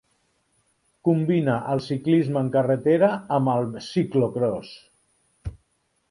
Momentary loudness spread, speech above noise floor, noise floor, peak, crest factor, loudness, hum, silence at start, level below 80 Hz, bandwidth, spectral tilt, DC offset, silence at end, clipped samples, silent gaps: 17 LU; 48 dB; -70 dBFS; -6 dBFS; 16 dB; -23 LUFS; none; 1.05 s; -52 dBFS; 11 kHz; -8 dB/octave; under 0.1%; 0.6 s; under 0.1%; none